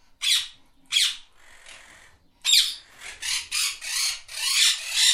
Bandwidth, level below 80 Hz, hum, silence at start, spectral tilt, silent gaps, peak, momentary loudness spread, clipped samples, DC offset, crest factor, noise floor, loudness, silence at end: 16.5 kHz; -60 dBFS; none; 0.2 s; 5 dB/octave; none; -4 dBFS; 15 LU; under 0.1%; under 0.1%; 22 dB; -54 dBFS; -22 LUFS; 0 s